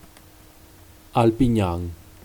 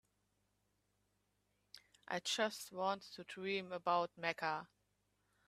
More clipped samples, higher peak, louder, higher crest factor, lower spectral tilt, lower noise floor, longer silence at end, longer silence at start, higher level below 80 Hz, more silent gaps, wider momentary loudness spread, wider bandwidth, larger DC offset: neither; first, -4 dBFS vs -20 dBFS; first, -22 LUFS vs -41 LUFS; about the same, 20 dB vs 24 dB; first, -7.5 dB/octave vs -3 dB/octave; second, -49 dBFS vs -82 dBFS; second, 0.3 s vs 0.85 s; second, 1.15 s vs 1.75 s; first, -40 dBFS vs -86 dBFS; neither; second, 12 LU vs 21 LU; first, 19.5 kHz vs 14.5 kHz; neither